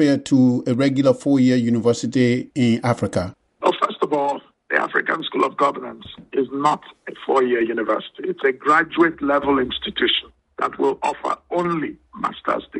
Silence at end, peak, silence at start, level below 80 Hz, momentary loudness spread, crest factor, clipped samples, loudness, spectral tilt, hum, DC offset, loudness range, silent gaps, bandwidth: 0 s; 0 dBFS; 0 s; -56 dBFS; 11 LU; 20 dB; under 0.1%; -20 LUFS; -6 dB/octave; none; under 0.1%; 3 LU; none; 11.5 kHz